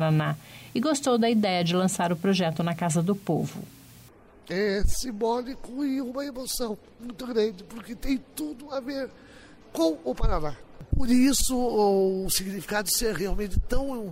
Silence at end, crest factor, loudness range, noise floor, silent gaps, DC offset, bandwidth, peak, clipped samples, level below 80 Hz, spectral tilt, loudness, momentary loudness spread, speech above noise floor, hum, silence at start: 0 s; 14 dB; 6 LU; -52 dBFS; none; under 0.1%; 16 kHz; -12 dBFS; under 0.1%; -36 dBFS; -5 dB/octave; -27 LUFS; 14 LU; 26 dB; none; 0 s